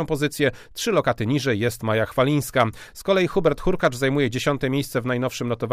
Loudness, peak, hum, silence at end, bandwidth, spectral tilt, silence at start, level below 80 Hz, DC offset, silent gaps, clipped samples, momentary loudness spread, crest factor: -22 LUFS; -6 dBFS; none; 0 s; 15.5 kHz; -5.5 dB/octave; 0 s; -42 dBFS; under 0.1%; none; under 0.1%; 4 LU; 16 dB